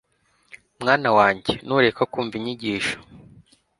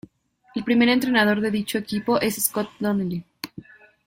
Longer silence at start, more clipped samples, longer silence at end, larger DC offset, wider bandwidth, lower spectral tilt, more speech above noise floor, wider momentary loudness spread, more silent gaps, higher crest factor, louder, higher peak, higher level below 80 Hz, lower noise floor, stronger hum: first, 0.8 s vs 0.55 s; neither; first, 0.65 s vs 0.45 s; neither; second, 11.5 kHz vs 16.5 kHz; about the same, -5 dB/octave vs -4 dB/octave; first, 44 dB vs 37 dB; second, 10 LU vs 15 LU; neither; about the same, 22 dB vs 18 dB; about the same, -21 LUFS vs -22 LUFS; about the same, -2 dBFS vs -4 dBFS; about the same, -56 dBFS vs -60 dBFS; first, -65 dBFS vs -59 dBFS; neither